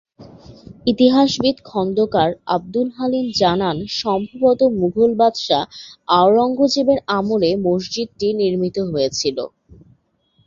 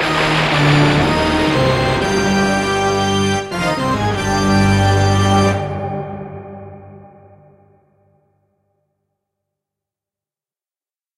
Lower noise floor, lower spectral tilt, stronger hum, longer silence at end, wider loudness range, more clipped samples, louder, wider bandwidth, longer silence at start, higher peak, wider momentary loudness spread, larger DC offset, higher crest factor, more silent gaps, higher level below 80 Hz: second, -61 dBFS vs under -90 dBFS; about the same, -5.5 dB/octave vs -5.5 dB/octave; neither; second, 0.75 s vs 4.1 s; second, 3 LU vs 13 LU; neither; second, -18 LUFS vs -15 LUFS; second, 7.6 kHz vs 15 kHz; first, 0.2 s vs 0 s; about the same, -2 dBFS vs -2 dBFS; second, 8 LU vs 14 LU; neither; about the same, 16 dB vs 16 dB; neither; second, -52 dBFS vs -36 dBFS